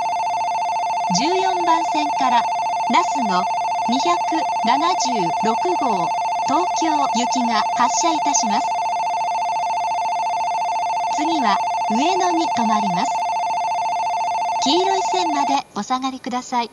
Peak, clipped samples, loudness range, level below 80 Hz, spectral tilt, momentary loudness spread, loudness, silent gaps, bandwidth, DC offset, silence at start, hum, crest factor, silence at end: -4 dBFS; under 0.1%; 2 LU; -62 dBFS; -3 dB/octave; 4 LU; -19 LUFS; none; 11.5 kHz; under 0.1%; 0 s; none; 16 dB; 0.05 s